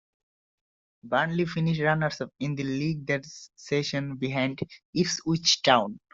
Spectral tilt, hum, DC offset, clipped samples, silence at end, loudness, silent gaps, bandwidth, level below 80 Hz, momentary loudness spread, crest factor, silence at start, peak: -4.5 dB/octave; none; under 0.1%; under 0.1%; 0.15 s; -27 LUFS; 4.85-4.93 s; 7.8 kHz; -62 dBFS; 10 LU; 22 dB; 1.05 s; -6 dBFS